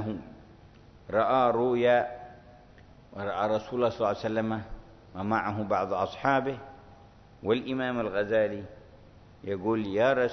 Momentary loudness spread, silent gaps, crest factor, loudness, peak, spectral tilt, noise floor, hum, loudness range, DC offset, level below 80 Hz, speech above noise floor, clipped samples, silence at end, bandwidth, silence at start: 19 LU; none; 20 dB; -28 LUFS; -10 dBFS; -7 dB/octave; -53 dBFS; none; 4 LU; under 0.1%; -56 dBFS; 26 dB; under 0.1%; 0 s; 6.4 kHz; 0 s